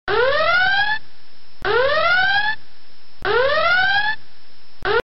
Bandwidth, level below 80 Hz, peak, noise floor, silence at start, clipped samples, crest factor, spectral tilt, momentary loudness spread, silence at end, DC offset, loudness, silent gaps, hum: 5.8 kHz; -44 dBFS; -6 dBFS; -51 dBFS; 0.05 s; under 0.1%; 16 dB; 1 dB/octave; 12 LU; 0 s; 6%; -18 LUFS; none; none